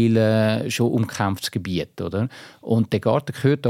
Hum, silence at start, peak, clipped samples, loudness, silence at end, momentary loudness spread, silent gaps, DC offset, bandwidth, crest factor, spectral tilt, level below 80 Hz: none; 0 s; -6 dBFS; under 0.1%; -22 LUFS; 0 s; 9 LU; none; under 0.1%; 16 kHz; 16 dB; -6.5 dB/octave; -56 dBFS